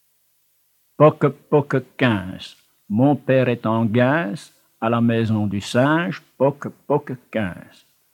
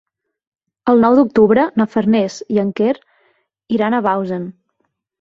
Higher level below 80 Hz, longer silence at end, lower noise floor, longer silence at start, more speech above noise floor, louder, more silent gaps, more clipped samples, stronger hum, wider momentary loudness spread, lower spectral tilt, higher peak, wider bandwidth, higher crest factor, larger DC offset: second, -66 dBFS vs -56 dBFS; second, 0.5 s vs 0.7 s; second, -64 dBFS vs -69 dBFS; first, 1 s vs 0.85 s; second, 44 dB vs 55 dB; second, -20 LUFS vs -16 LUFS; neither; neither; first, 50 Hz at -50 dBFS vs none; about the same, 13 LU vs 12 LU; about the same, -7.5 dB/octave vs -7 dB/octave; about the same, -2 dBFS vs -2 dBFS; first, 17 kHz vs 7.6 kHz; about the same, 20 dB vs 16 dB; neither